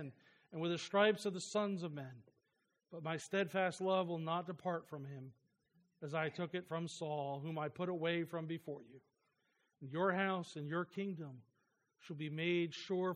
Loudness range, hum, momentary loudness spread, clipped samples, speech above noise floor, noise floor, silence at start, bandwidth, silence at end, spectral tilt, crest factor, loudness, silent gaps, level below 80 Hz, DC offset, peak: 4 LU; none; 16 LU; under 0.1%; 44 dB; -84 dBFS; 0 s; 15 kHz; 0 s; -5.5 dB/octave; 22 dB; -40 LUFS; none; -88 dBFS; under 0.1%; -18 dBFS